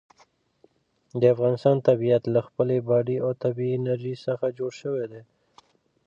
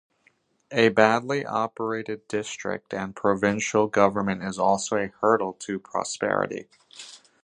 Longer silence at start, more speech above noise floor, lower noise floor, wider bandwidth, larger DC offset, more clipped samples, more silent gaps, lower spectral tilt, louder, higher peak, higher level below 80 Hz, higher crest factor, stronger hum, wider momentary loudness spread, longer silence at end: first, 1.15 s vs 0.7 s; about the same, 39 dB vs 41 dB; about the same, -63 dBFS vs -65 dBFS; second, 7.6 kHz vs 10.5 kHz; neither; neither; neither; first, -9 dB/octave vs -4.5 dB/octave; about the same, -24 LUFS vs -25 LUFS; second, -6 dBFS vs -2 dBFS; second, -70 dBFS vs -62 dBFS; second, 18 dB vs 24 dB; neither; about the same, 10 LU vs 12 LU; first, 0.85 s vs 0.3 s